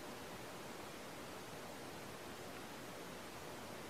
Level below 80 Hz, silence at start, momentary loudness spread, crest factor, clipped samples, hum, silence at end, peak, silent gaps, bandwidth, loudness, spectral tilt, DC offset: -72 dBFS; 0 s; 0 LU; 14 dB; under 0.1%; none; 0 s; -36 dBFS; none; 16 kHz; -50 LUFS; -3.5 dB/octave; under 0.1%